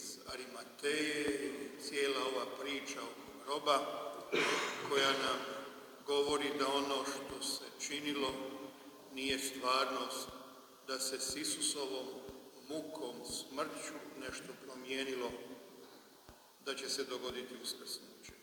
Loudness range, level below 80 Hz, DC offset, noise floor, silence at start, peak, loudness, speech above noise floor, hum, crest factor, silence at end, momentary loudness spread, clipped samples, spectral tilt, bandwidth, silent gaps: 8 LU; -74 dBFS; under 0.1%; -61 dBFS; 0 s; -18 dBFS; -38 LUFS; 22 dB; none; 22 dB; 0 s; 16 LU; under 0.1%; -1.5 dB/octave; over 20 kHz; none